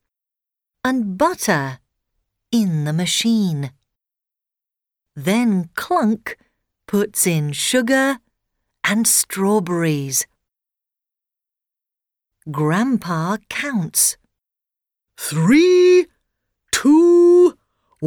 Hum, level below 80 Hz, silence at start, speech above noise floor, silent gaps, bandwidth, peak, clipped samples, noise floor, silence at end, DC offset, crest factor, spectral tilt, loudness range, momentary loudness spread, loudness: none; -60 dBFS; 0.85 s; 70 dB; none; over 20 kHz; -6 dBFS; under 0.1%; -87 dBFS; 0 s; under 0.1%; 14 dB; -4.5 dB/octave; 8 LU; 13 LU; -17 LUFS